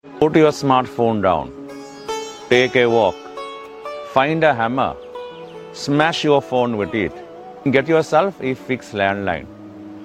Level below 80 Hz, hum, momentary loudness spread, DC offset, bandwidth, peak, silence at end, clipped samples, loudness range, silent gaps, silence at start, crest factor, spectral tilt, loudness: -52 dBFS; none; 19 LU; under 0.1%; 13.5 kHz; 0 dBFS; 0 s; under 0.1%; 3 LU; none; 0.05 s; 18 dB; -5.5 dB/octave; -18 LUFS